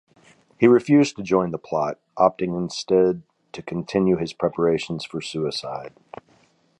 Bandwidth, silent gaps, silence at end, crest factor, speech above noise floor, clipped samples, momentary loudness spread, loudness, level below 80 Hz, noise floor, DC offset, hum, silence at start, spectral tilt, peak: 11 kHz; none; 0.9 s; 20 dB; 38 dB; under 0.1%; 15 LU; -22 LUFS; -58 dBFS; -60 dBFS; under 0.1%; none; 0.6 s; -6 dB/octave; -2 dBFS